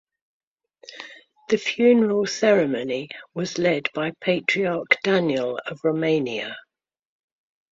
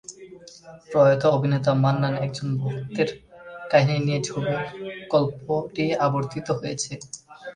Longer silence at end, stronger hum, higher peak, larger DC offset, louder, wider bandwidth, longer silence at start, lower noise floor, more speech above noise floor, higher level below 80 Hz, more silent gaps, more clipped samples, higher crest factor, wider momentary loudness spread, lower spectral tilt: first, 1.15 s vs 0 s; neither; about the same, -2 dBFS vs -4 dBFS; neither; about the same, -22 LUFS vs -23 LUFS; second, 7.8 kHz vs 10 kHz; first, 0.9 s vs 0.1 s; first, -49 dBFS vs -45 dBFS; first, 27 dB vs 22 dB; second, -68 dBFS vs -60 dBFS; neither; neither; about the same, 22 dB vs 20 dB; second, 16 LU vs 20 LU; about the same, -5 dB/octave vs -6 dB/octave